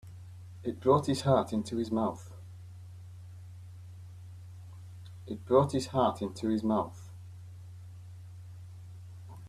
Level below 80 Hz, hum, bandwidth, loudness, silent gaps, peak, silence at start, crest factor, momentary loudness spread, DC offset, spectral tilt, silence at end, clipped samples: -64 dBFS; none; 13.5 kHz; -30 LUFS; none; -10 dBFS; 0.05 s; 22 dB; 22 LU; under 0.1%; -7 dB/octave; 0 s; under 0.1%